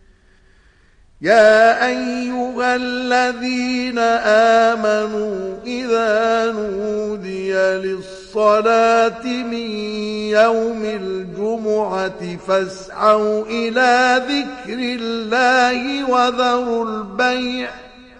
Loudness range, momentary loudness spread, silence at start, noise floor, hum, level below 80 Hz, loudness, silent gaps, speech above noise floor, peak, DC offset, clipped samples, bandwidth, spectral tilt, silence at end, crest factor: 3 LU; 11 LU; 1.2 s; -52 dBFS; none; -52 dBFS; -17 LUFS; none; 35 dB; -2 dBFS; under 0.1%; under 0.1%; 10 kHz; -4 dB/octave; 0.15 s; 16 dB